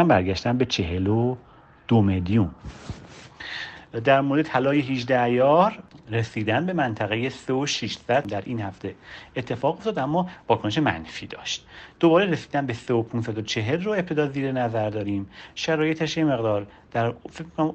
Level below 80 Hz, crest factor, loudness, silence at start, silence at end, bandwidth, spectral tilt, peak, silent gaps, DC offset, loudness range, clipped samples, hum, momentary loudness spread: -52 dBFS; 18 dB; -24 LUFS; 0 s; 0 s; 8.6 kHz; -6 dB/octave; -6 dBFS; none; under 0.1%; 4 LU; under 0.1%; none; 15 LU